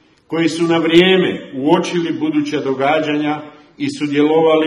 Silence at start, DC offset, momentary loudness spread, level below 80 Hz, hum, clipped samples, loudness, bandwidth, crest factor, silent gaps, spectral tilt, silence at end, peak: 0.3 s; under 0.1%; 11 LU; -60 dBFS; none; under 0.1%; -16 LUFS; 11.5 kHz; 16 dB; none; -5.5 dB/octave; 0 s; 0 dBFS